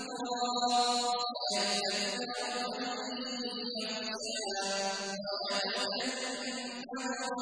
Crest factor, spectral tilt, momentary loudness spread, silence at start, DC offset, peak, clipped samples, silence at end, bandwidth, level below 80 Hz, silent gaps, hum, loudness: 16 dB; -1.5 dB/octave; 7 LU; 0 s; under 0.1%; -18 dBFS; under 0.1%; 0 s; 10.5 kHz; -78 dBFS; none; none; -33 LUFS